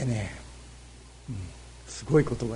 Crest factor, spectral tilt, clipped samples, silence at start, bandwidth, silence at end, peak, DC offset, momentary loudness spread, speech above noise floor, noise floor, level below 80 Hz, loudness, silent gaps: 20 dB; -6.5 dB/octave; under 0.1%; 0 s; 10.5 kHz; 0 s; -10 dBFS; under 0.1%; 24 LU; 21 dB; -48 dBFS; -46 dBFS; -29 LUFS; none